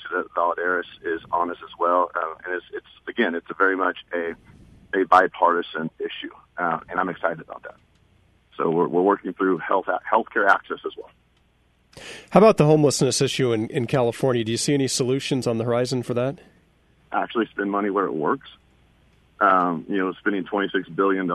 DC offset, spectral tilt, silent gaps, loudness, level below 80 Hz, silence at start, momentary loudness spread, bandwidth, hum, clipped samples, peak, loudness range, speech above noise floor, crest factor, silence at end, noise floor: under 0.1%; -5 dB/octave; none; -22 LUFS; -60 dBFS; 0 s; 14 LU; 12 kHz; none; under 0.1%; -2 dBFS; 6 LU; 40 dB; 20 dB; 0 s; -62 dBFS